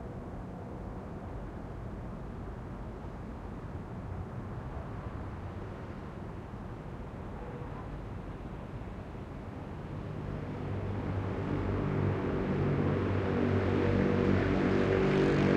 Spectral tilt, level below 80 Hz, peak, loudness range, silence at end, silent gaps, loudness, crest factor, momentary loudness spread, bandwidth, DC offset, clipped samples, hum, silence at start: -8.5 dB/octave; -46 dBFS; -12 dBFS; 13 LU; 0 s; none; -35 LUFS; 20 dB; 15 LU; 8.6 kHz; under 0.1%; under 0.1%; none; 0 s